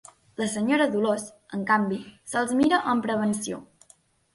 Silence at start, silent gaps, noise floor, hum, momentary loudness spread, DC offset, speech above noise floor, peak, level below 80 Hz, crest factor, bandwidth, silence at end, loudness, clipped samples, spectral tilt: 0.4 s; none; -60 dBFS; none; 13 LU; under 0.1%; 35 dB; -8 dBFS; -64 dBFS; 18 dB; 11.5 kHz; 0.7 s; -25 LUFS; under 0.1%; -4.5 dB/octave